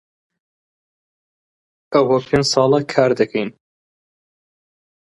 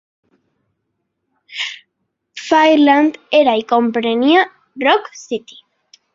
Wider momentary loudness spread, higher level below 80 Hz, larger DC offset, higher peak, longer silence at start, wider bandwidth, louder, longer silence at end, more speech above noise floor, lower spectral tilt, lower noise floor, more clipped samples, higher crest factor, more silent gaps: second, 6 LU vs 16 LU; first, -54 dBFS vs -64 dBFS; neither; about the same, -2 dBFS vs -2 dBFS; first, 1.9 s vs 1.5 s; first, 11.5 kHz vs 7.6 kHz; about the same, -17 LUFS vs -15 LUFS; first, 1.55 s vs 0.75 s; first, over 74 dB vs 59 dB; first, -5 dB/octave vs -3.5 dB/octave; first, under -90 dBFS vs -72 dBFS; neither; about the same, 20 dB vs 16 dB; neither